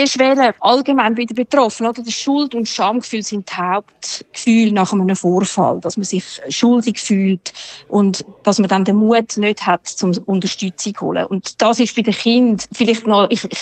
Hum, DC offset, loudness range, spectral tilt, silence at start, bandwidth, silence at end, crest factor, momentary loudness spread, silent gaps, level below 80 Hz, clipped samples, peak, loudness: none; under 0.1%; 2 LU; -4.5 dB/octave; 0 s; 9.2 kHz; 0 s; 14 dB; 9 LU; none; -62 dBFS; under 0.1%; 0 dBFS; -16 LUFS